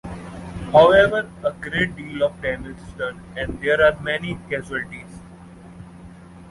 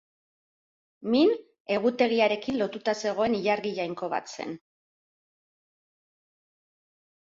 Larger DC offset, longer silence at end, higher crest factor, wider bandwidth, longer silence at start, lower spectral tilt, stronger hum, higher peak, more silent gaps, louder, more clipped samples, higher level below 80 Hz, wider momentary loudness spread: neither; second, 0 s vs 2.65 s; about the same, 20 dB vs 20 dB; first, 11.5 kHz vs 7.8 kHz; second, 0.05 s vs 1 s; about the same, -6 dB/octave vs -5 dB/octave; neither; first, -2 dBFS vs -10 dBFS; second, none vs 1.60-1.65 s; first, -20 LUFS vs -27 LUFS; neither; first, -44 dBFS vs -68 dBFS; first, 25 LU vs 14 LU